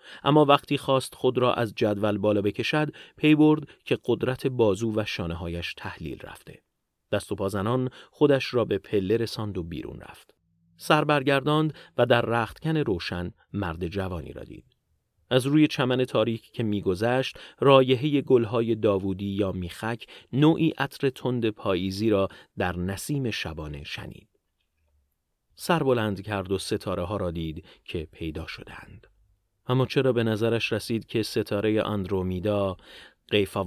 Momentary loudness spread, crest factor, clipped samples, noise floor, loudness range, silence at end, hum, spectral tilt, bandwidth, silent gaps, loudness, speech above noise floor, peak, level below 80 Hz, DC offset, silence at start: 14 LU; 24 dB; under 0.1%; -75 dBFS; 7 LU; 0 s; none; -6.5 dB/octave; 15.5 kHz; none; -26 LUFS; 50 dB; -2 dBFS; -50 dBFS; under 0.1%; 0.05 s